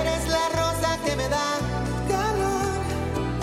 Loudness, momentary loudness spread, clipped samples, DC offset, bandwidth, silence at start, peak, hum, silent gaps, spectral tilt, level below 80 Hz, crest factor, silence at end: -25 LUFS; 4 LU; under 0.1%; under 0.1%; 16.5 kHz; 0 s; -12 dBFS; none; none; -4.5 dB/octave; -36 dBFS; 12 dB; 0 s